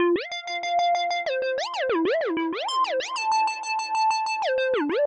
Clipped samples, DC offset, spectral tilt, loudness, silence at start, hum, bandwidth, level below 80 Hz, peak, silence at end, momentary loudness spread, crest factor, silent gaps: under 0.1%; under 0.1%; -2 dB/octave; -25 LUFS; 0 s; none; 9.6 kHz; -70 dBFS; -14 dBFS; 0 s; 4 LU; 10 dB; none